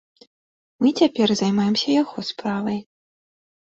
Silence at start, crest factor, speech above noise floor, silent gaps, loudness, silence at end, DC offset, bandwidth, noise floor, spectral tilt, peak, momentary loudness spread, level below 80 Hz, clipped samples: 0.8 s; 18 dB; over 70 dB; none; -21 LUFS; 0.9 s; under 0.1%; 7.8 kHz; under -90 dBFS; -5.5 dB/octave; -4 dBFS; 9 LU; -64 dBFS; under 0.1%